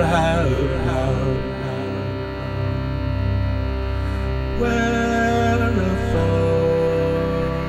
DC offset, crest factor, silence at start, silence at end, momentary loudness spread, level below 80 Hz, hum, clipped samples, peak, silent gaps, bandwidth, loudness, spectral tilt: under 0.1%; 14 dB; 0 s; 0 s; 7 LU; -28 dBFS; none; under 0.1%; -6 dBFS; none; 11.5 kHz; -21 LUFS; -7 dB/octave